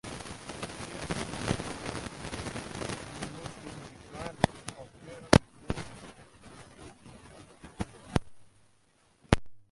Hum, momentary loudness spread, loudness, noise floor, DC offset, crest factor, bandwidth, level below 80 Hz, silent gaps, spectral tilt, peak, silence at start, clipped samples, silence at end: none; 21 LU; -34 LUFS; -67 dBFS; under 0.1%; 32 dB; 11.5 kHz; -48 dBFS; none; -5 dB/octave; -2 dBFS; 0.05 s; under 0.1%; 0.1 s